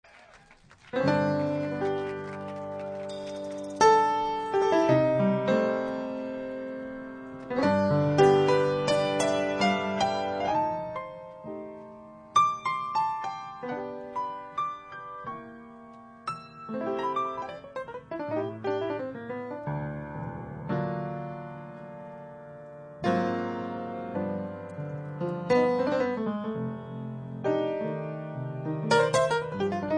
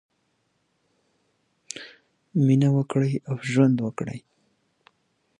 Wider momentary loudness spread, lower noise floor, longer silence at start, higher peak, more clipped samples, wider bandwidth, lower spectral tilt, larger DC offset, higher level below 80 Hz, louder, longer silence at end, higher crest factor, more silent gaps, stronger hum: about the same, 17 LU vs 19 LU; second, -56 dBFS vs -72 dBFS; second, 0.15 s vs 1.75 s; about the same, -8 dBFS vs -6 dBFS; neither; about the same, 10 kHz vs 10.5 kHz; second, -6 dB/octave vs -7.5 dB/octave; neither; about the same, -62 dBFS vs -66 dBFS; second, -29 LUFS vs -23 LUFS; second, 0 s vs 1.2 s; about the same, 20 dB vs 20 dB; neither; neither